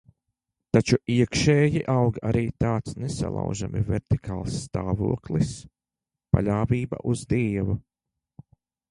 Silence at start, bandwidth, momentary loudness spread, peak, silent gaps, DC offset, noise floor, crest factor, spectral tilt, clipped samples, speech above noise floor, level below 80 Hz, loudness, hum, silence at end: 0.75 s; 11 kHz; 9 LU; -4 dBFS; none; under 0.1%; -89 dBFS; 22 dB; -6.5 dB/octave; under 0.1%; 65 dB; -42 dBFS; -25 LUFS; none; 1.1 s